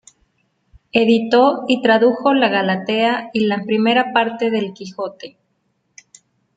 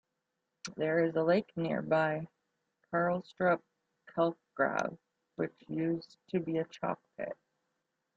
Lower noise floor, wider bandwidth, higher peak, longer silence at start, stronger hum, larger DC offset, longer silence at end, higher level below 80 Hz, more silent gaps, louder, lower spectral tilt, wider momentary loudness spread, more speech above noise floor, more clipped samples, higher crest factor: second, -67 dBFS vs -85 dBFS; first, 9 kHz vs 8 kHz; first, -2 dBFS vs -16 dBFS; first, 0.95 s vs 0.65 s; neither; neither; first, 1.25 s vs 0.85 s; first, -62 dBFS vs -76 dBFS; neither; first, -17 LUFS vs -34 LUFS; about the same, -5.5 dB/octave vs -6.5 dB/octave; about the same, 14 LU vs 12 LU; about the same, 51 dB vs 53 dB; neither; about the same, 16 dB vs 18 dB